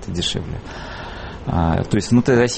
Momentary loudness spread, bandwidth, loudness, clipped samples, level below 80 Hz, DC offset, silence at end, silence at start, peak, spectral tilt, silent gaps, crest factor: 16 LU; 8.8 kHz; -19 LUFS; under 0.1%; -34 dBFS; under 0.1%; 0 s; 0 s; -4 dBFS; -5.5 dB/octave; none; 16 dB